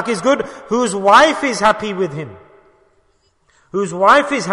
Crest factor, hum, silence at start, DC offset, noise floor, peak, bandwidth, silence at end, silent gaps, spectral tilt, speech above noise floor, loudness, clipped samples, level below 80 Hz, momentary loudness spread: 16 dB; none; 0 s; under 0.1%; -59 dBFS; 0 dBFS; 11 kHz; 0 s; none; -4 dB/octave; 44 dB; -14 LUFS; under 0.1%; -54 dBFS; 13 LU